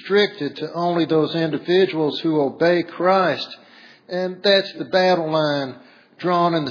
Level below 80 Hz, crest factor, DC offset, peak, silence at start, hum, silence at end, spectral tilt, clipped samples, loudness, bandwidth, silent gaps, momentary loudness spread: -74 dBFS; 16 dB; under 0.1%; -4 dBFS; 0 s; none; 0 s; -6.5 dB/octave; under 0.1%; -20 LUFS; 5.4 kHz; none; 10 LU